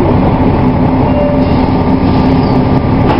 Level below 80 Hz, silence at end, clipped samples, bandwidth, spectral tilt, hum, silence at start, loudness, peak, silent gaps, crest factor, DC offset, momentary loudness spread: -20 dBFS; 0 s; 0.3%; 5.6 kHz; -10 dB/octave; none; 0 s; -10 LUFS; 0 dBFS; none; 8 dB; 2%; 1 LU